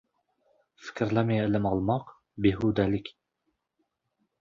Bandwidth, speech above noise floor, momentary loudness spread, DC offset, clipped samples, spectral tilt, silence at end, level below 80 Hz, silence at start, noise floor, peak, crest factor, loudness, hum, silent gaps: 7.4 kHz; 53 dB; 18 LU; under 0.1%; under 0.1%; -8.5 dB/octave; 1.3 s; -52 dBFS; 0.8 s; -79 dBFS; -10 dBFS; 20 dB; -28 LUFS; none; none